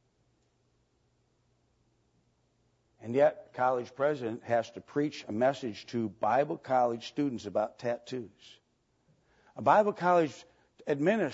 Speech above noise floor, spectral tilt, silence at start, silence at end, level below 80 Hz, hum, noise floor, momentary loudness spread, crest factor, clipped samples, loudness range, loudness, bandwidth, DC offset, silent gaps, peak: 43 dB; -6.5 dB/octave; 3 s; 0 s; -76 dBFS; none; -73 dBFS; 11 LU; 22 dB; under 0.1%; 3 LU; -30 LUFS; 8 kHz; under 0.1%; none; -10 dBFS